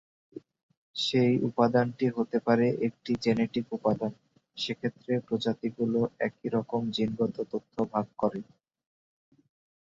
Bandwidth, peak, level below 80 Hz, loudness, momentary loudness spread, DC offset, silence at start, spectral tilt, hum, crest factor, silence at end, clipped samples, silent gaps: 7.8 kHz; -10 dBFS; -66 dBFS; -29 LUFS; 11 LU; under 0.1%; 0.35 s; -6.5 dB/octave; none; 20 dB; 1.35 s; under 0.1%; 0.63-0.69 s, 0.77-0.94 s